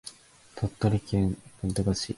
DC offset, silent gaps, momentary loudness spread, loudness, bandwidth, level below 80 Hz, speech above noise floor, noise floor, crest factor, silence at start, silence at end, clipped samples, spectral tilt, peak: under 0.1%; none; 12 LU; -29 LUFS; 11.5 kHz; -44 dBFS; 22 dB; -50 dBFS; 18 dB; 0.05 s; 0 s; under 0.1%; -6 dB/octave; -10 dBFS